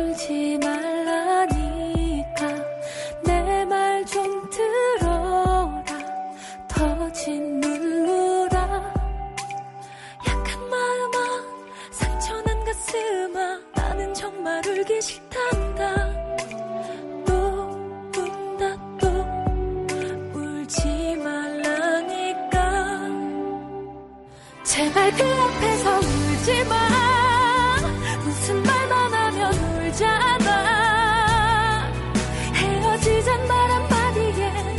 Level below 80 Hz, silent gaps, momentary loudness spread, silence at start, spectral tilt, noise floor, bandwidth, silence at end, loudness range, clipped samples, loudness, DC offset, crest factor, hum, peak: -34 dBFS; none; 12 LU; 0 s; -4.5 dB/octave; -44 dBFS; 11.5 kHz; 0 s; 7 LU; under 0.1%; -23 LUFS; under 0.1%; 16 dB; none; -6 dBFS